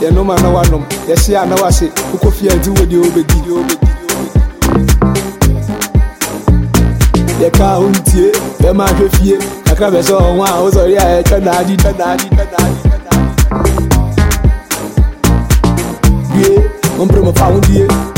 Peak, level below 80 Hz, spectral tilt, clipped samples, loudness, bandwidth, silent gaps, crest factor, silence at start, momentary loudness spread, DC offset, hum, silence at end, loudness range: 0 dBFS; -14 dBFS; -5.5 dB/octave; under 0.1%; -11 LUFS; 17 kHz; none; 10 dB; 0 s; 5 LU; under 0.1%; none; 0 s; 2 LU